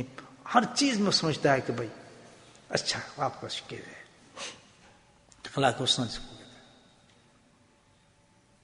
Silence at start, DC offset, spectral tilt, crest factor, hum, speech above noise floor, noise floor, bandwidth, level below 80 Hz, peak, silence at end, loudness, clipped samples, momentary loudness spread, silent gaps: 0 s; under 0.1%; -3.5 dB/octave; 26 dB; none; 35 dB; -63 dBFS; 10.5 kHz; -62 dBFS; -8 dBFS; 2.05 s; -29 LUFS; under 0.1%; 23 LU; none